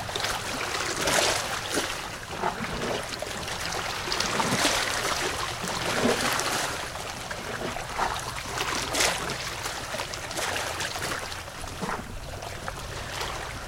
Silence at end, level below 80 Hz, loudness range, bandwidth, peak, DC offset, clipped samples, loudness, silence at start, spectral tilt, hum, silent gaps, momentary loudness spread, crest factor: 0 s; -46 dBFS; 6 LU; 17 kHz; -6 dBFS; under 0.1%; under 0.1%; -28 LUFS; 0 s; -2 dB/octave; none; none; 10 LU; 24 dB